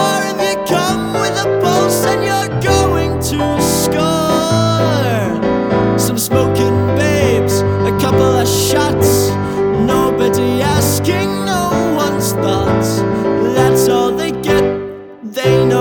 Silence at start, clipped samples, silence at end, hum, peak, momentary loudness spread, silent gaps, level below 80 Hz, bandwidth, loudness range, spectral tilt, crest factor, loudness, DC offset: 0 s; under 0.1%; 0 s; none; 0 dBFS; 4 LU; none; -36 dBFS; 19.5 kHz; 1 LU; -5 dB/octave; 12 dB; -14 LUFS; under 0.1%